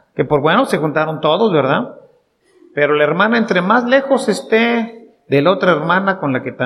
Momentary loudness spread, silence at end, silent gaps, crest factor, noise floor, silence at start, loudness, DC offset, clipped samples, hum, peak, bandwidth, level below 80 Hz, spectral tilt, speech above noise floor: 6 LU; 0 s; none; 14 dB; -55 dBFS; 0.15 s; -15 LUFS; under 0.1%; under 0.1%; none; 0 dBFS; 13.5 kHz; -58 dBFS; -6 dB/octave; 41 dB